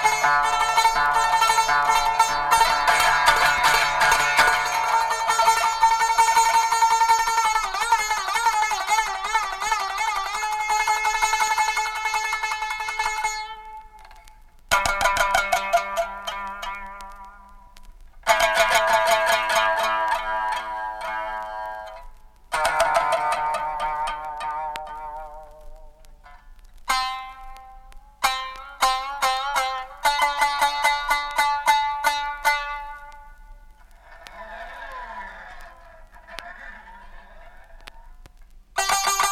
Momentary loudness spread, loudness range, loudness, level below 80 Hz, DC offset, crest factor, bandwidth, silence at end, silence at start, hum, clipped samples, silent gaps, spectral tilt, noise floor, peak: 18 LU; 14 LU; -21 LUFS; -44 dBFS; under 0.1%; 20 dB; 16.5 kHz; 0 s; 0 s; none; under 0.1%; none; 0.5 dB/octave; -48 dBFS; -2 dBFS